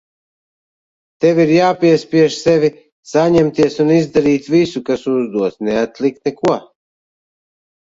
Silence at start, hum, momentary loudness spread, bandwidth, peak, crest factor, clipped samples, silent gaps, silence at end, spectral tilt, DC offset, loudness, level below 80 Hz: 1.2 s; none; 7 LU; 7.8 kHz; 0 dBFS; 14 dB; under 0.1%; 2.92-3.03 s; 1.3 s; -6.5 dB/octave; under 0.1%; -15 LUFS; -54 dBFS